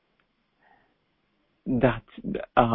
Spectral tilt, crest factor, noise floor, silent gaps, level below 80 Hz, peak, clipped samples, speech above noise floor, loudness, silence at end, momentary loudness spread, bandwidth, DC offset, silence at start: -11 dB/octave; 24 dB; -72 dBFS; none; -48 dBFS; -4 dBFS; under 0.1%; 47 dB; -27 LUFS; 0 s; 11 LU; 4 kHz; under 0.1%; 1.65 s